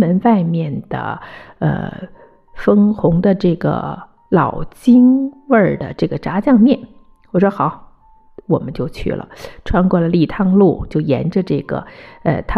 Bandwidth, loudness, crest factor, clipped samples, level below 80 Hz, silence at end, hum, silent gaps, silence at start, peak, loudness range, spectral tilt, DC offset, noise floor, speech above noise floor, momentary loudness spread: 11 kHz; -16 LUFS; 14 dB; under 0.1%; -36 dBFS; 0 s; none; none; 0 s; -2 dBFS; 4 LU; -9.5 dB/octave; under 0.1%; -47 dBFS; 32 dB; 14 LU